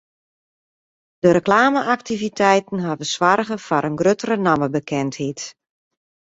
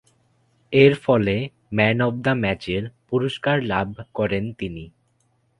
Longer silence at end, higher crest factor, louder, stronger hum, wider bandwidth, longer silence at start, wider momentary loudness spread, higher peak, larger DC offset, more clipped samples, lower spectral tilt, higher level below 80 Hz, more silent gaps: about the same, 0.7 s vs 0.7 s; about the same, 18 dB vs 22 dB; about the same, -19 LUFS vs -21 LUFS; neither; second, 8 kHz vs 11 kHz; first, 1.25 s vs 0.7 s; second, 10 LU vs 13 LU; about the same, -2 dBFS vs 0 dBFS; neither; neither; second, -5 dB/octave vs -7.5 dB/octave; second, -58 dBFS vs -50 dBFS; neither